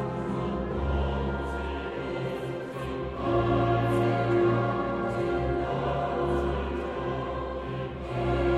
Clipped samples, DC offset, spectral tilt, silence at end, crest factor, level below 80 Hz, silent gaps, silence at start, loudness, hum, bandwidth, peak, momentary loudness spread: under 0.1%; under 0.1%; -8 dB/octave; 0 s; 14 dB; -38 dBFS; none; 0 s; -29 LUFS; none; 11 kHz; -14 dBFS; 9 LU